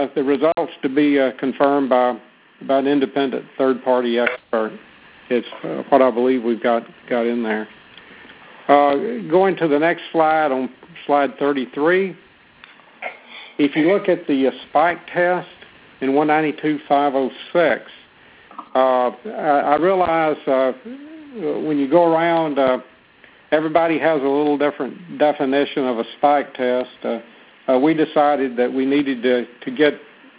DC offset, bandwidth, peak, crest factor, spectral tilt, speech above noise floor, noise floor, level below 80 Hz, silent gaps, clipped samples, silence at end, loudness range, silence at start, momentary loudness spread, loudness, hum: under 0.1%; 4 kHz; 0 dBFS; 18 dB; -9.5 dB/octave; 31 dB; -49 dBFS; -64 dBFS; none; under 0.1%; 0.35 s; 2 LU; 0 s; 12 LU; -19 LUFS; none